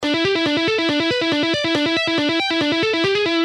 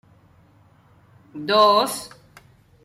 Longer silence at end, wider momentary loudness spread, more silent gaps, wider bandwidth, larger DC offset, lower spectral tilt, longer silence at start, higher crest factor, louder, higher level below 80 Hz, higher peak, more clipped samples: second, 0 s vs 0.8 s; second, 1 LU vs 25 LU; neither; second, 11 kHz vs 16 kHz; neither; about the same, -4 dB/octave vs -3 dB/octave; second, 0 s vs 1.35 s; second, 12 dB vs 20 dB; about the same, -18 LUFS vs -18 LUFS; first, -56 dBFS vs -66 dBFS; about the same, -6 dBFS vs -4 dBFS; neither